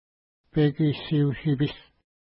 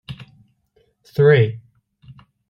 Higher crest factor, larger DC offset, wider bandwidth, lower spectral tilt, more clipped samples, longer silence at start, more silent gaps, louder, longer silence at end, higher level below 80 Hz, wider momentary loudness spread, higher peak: about the same, 14 dB vs 18 dB; neither; about the same, 5.6 kHz vs 6 kHz; first, -12 dB/octave vs -8.5 dB/octave; neither; first, 0.55 s vs 0.1 s; neither; second, -25 LUFS vs -16 LUFS; second, 0.55 s vs 0.9 s; about the same, -52 dBFS vs -56 dBFS; second, 7 LU vs 25 LU; second, -12 dBFS vs -4 dBFS